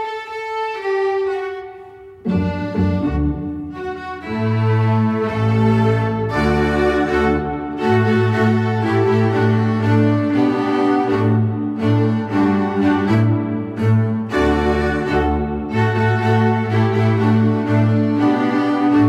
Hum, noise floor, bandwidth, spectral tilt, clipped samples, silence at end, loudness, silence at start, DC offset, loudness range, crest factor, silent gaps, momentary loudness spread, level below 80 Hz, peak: none; -38 dBFS; 8.2 kHz; -8.5 dB/octave; under 0.1%; 0 s; -17 LUFS; 0 s; under 0.1%; 5 LU; 12 dB; none; 8 LU; -34 dBFS; -4 dBFS